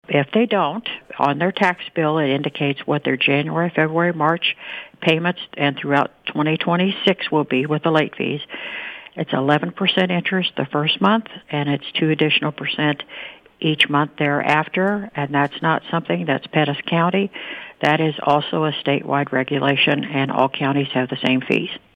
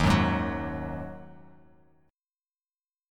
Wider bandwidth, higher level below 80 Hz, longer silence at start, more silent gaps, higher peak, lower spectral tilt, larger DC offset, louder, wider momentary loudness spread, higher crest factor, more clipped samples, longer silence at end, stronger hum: second, 10 kHz vs 16.5 kHz; second, -64 dBFS vs -42 dBFS; about the same, 0.1 s vs 0 s; neither; first, -2 dBFS vs -8 dBFS; about the same, -7 dB/octave vs -6.5 dB/octave; neither; first, -19 LUFS vs -29 LUFS; second, 7 LU vs 22 LU; about the same, 18 dB vs 22 dB; neither; second, 0.2 s vs 1.75 s; neither